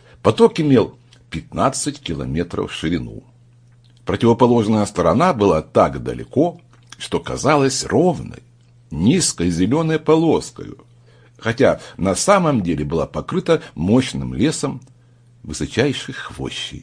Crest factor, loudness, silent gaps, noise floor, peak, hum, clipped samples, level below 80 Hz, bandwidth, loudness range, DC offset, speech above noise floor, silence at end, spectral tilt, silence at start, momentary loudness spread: 18 dB; -18 LUFS; none; -50 dBFS; 0 dBFS; none; under 0.1%; -42 dBFS; 10.5 kHz; 4 LU; under 0.1%; 32 dB; 0 s; -5.5 dB/octave; 0.25 s; 14 LU